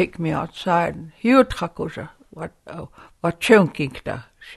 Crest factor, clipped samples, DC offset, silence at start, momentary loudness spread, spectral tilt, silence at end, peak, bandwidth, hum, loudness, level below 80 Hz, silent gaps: 20 dB; under 0.1%; under 0.1%; 0 s; 21 LU; -6 dB/octave; 0 s; 0 dBFS; 12.5 kHz; none; -20 LUFS; -48 dBFS; none